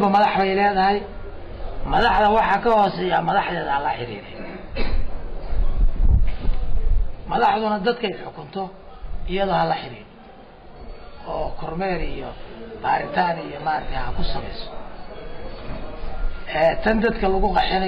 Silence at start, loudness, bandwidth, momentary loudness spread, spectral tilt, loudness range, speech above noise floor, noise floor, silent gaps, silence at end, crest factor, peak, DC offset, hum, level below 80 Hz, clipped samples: 0 s; -22 LUFS; 5.2 kHz; 19 LU; -7.5 dB/octave; 8 LU; 22 dB; -43 dBFS; none; 0 s; 12 dB; -8 dBFS; under 0.1%; none; -26 dBFS; under 0.1%